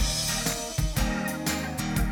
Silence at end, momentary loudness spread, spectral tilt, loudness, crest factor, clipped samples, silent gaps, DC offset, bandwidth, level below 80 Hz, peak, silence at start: 0 s; 4 LU; -3.5 dB/octave; -28 LUFS; 14 dB; under 0.1%; none; under 0.1%; 19.5 kHz; -34 dBFS; -12 dBFS; 0 s